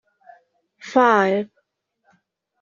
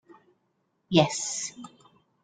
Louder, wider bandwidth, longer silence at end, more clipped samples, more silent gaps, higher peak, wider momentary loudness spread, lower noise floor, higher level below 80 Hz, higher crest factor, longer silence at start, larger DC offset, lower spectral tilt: first, -18 LUFS vs -26 LUFS; second, 7.4 kHz vs 9.6 kHz; first, 1.15 s vs 0.55 s; neither; neither; first, -2 dBFS vs -6 dBFS; second, 21 LU vs 24 LU; second, -70 dBFS vs -74 dBFS; about the same, -72 dBFS vs -68 dBFS; about the same, 20 dB vs 24 dB; about the same, 0.85 s vs 0.9 s; neither; about the same, -3.5 dB/octave vs -4 dB/octave